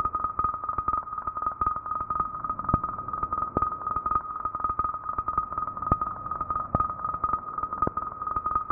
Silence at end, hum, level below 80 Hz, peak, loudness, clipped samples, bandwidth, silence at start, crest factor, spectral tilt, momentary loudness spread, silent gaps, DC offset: 0 s; none; -46 dBFS; -8 dBFS; -29 LUFS; under 0.1%; 2.6 kHz; 0 s; 22 dB; -4 dB/octave; 4 LU; none; under 0.1%